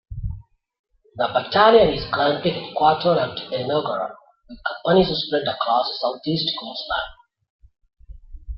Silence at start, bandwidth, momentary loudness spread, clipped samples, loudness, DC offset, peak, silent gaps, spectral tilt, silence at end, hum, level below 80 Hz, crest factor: 0.1 s; 6 kHz; 14 LU; under 0.1%; -20 LUFS; under 0.1%; -2 dBFS; 0.79-0.84 s, 7.50-7.59 s; -8 dB/octave; 0 s; none; -42 dBFS; 20 dB